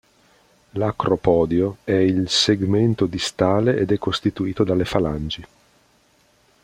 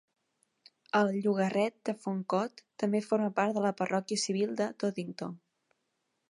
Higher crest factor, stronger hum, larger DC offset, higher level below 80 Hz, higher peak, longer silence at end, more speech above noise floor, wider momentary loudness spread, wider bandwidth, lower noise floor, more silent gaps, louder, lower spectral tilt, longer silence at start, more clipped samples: about the same, 18 dB vs 20 dB; neither; neither; first, -46 dBFS vs -82 dBFS; first, -2 dBFS vs -14 dBFS; first, 1.2 s vs 0.9 s; second, 39 dB vs 50 dB; second, 7 LU vs 10 LU; first, 15.5 kHz vs 11.5 kHz; second, -59 dBFS vs -81 dBFS; neither; first, -20 LUFS vs -32 LUFS; about the same, -5.5 dB/octave vs -5 dB/octave; second, 0.75 s vs 0.95 s; neither